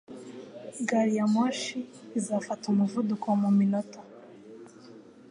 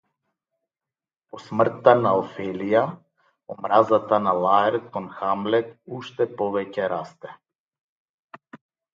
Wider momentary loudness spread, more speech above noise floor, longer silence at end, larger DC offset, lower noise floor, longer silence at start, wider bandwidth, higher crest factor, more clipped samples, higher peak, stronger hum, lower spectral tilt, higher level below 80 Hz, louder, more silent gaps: first, 24 LU vs 17 LU; second, 23 dB vs over 68 dB; about the same, 0.3 s vs 0.4 s; neither; second, -50 dBFS vs under -90 dBFS; second, 0.1 s vs 1.35 s; first, 11 kHz vs 7.4 kHz; second, 14 dB vs 24 dB; neither; second, -14 dBFS vs 0 dBFS; neither; second, -6 dB/octave vs -7.5 dB/octave; second, -78 dBFS vs -68 dBFS; second, -28 LUFS vs -22 LUFS; second, none vs 7.55-7.72 s, 7.81-8.29 s